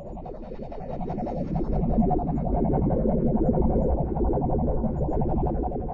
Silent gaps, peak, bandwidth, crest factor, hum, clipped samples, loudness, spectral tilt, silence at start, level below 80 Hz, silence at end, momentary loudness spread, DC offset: none; -10 dBFS; 3.8 kHz; 14 dB; none; under 0.1%; -26 LUFS; -12.5 dB/octave; 0 s; -30 dBFS; 0 s; 13 LU; under 0.1%